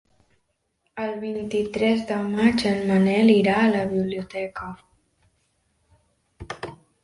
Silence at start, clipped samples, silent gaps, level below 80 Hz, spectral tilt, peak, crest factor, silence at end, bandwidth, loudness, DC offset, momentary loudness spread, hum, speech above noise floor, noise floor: 0.95 s; under 0.1%; none; -54 dBFS; -6.5 dB/octave; -6 dBFS; 18 dB; 0.3 s; 11.5 kHz; -22 LUFS; under 0.1%; 19 LU; none; 51 dB; -72 dBFS